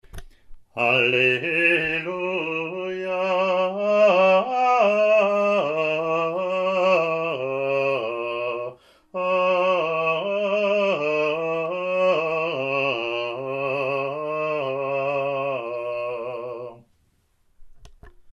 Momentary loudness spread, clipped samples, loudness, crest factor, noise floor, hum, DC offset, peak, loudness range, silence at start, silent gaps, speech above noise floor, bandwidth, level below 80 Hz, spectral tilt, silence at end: 10 LU; under 0.1%; -22 LUFS; 18 dB; -64 dBFS; none; under 0.1%; -6 dBFS; 7 LU; 0.15 s; none; 43 dB; 10.5 kHz; -56 dBFS; -5.5 dB/octave; 0 s